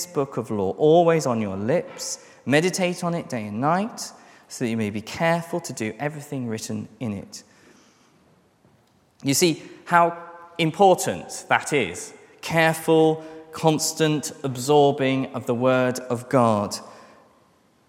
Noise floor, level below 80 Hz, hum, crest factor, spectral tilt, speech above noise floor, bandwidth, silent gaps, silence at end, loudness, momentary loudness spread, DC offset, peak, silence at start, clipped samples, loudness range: -60 dBFS; -68 dBFS; none; 22 dB; -4.5 dB/octave; 38 dB; 16.5 kHz; none; 0.9 s; -23 LUFS; 14 LU; under 0.1%; -2 dBFS; 0 s; under 0.1%; 7 LU